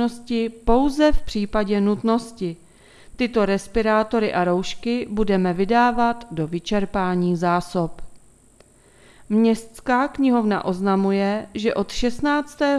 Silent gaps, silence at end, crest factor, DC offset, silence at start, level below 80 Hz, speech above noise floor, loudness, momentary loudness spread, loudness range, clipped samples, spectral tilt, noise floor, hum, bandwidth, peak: none; 0 s; 18 dB; under 0.1%; 0 s; -38 dBFS; 33 dB; -21 LUFS; 7 LU; 3 LU; under 0.1%; -6.5 dB/octave; -53 dBFS; none; 12.5 kHz; -2 dBFS